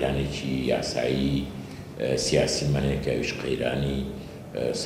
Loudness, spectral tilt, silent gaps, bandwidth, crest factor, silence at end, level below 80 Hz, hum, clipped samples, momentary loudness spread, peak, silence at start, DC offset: -27 LUFS; -5 dB/octave; none; 15.5 kHz; 18 dB; 0 s; -42 dBFS; none; under 0.1%; 13 LU; -10 dBFS; 0 s; under 0.1%